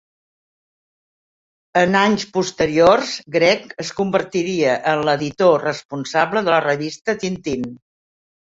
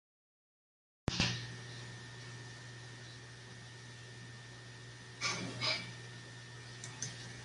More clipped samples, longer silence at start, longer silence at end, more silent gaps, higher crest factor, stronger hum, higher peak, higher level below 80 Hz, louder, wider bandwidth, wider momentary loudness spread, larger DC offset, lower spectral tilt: neither; first, 1.75 s vs 1.05 s; first, 0.7 s vs 0 s; first, 5.85-5.89 s, 7.01-7.05 s vs none; second, 18 dB vs 28 dB; neither; first, -2 dBFS vs -18 dBFS; first, -54 dBFS vs -62 dBFS; first, -18 LUFS vs -42 LUFS; second, 7.8 kHz vs 11.5 kHz; second, 10 LU vs 16 LU; neither; first, -4.5 dB/octave vs -3 dB/octave